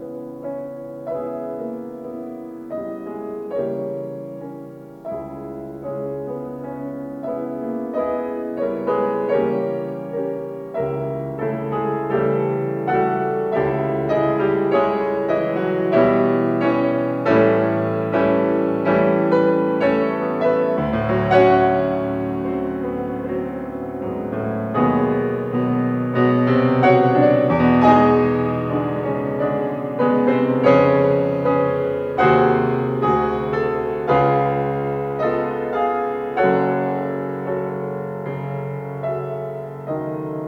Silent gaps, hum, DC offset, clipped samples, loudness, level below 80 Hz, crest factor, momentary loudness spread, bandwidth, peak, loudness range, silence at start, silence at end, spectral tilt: none; none; under 0.1%; under 0.1%; -20 LUFS; -50 dBFS; 18 dB; 14 LU; 6.6 kHz; -2 dBFS; 12 LU; 0 s; 0 s; -9 dB/octave